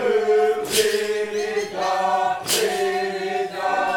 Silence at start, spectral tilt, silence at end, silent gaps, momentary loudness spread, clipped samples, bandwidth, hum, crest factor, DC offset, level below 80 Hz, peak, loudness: 0 s; -2 dB/octave; 0 s; none; 6 LU; under 0.1%; 17.5 kHz; none; 14 dB; under 0.1%; -64 dBFS; -6 dBFS; -21 LUFS